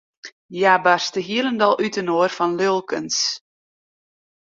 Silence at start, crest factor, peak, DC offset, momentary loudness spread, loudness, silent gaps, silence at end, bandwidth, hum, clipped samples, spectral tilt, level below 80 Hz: 0.25 s; 20 dB; -2 dBFS; under 0.1%; 7 LU; -19 LUFS; 0.32-0.49 s; 1.05 s; 7.8 kHz; none; under 0.1%; -3 dB/octave; -68 dBFS